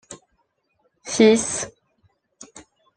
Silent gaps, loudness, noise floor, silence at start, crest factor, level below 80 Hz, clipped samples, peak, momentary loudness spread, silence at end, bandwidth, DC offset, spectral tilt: none; -19 LUFS; -70 dBFS; 0.1 s; 22 dB; -62 dBFS; under 0.1%; -2 dBFS; 27 LU; 0.35 s; 10 kHz; under 0.1%; -3.5 dB/octave